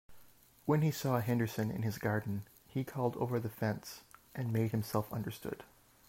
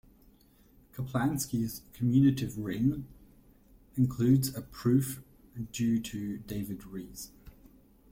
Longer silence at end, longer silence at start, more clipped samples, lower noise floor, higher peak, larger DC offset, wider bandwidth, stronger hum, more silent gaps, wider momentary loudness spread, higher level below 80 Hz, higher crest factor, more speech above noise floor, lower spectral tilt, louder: second, 0.45 s vs 0.6 s; second, 0.1 s vs 0.95 s; neither; about the same, -61 dBFS vs -61 dBFS; second, -18 dBFS vs -14 dBFS; neither; about the same, 16 kHz vs 16.5 kHz; neither; neither; second, 12 LU vs 19 LU; second, -68 dBFS vs -56 dBFS; about the same, 18 dB vs 18 dB; second, 26 dB vs 31 dB; about the same, -7 dB/octave vs -6.5 dB/octave; second, -36 LUFS vs -31 LUFS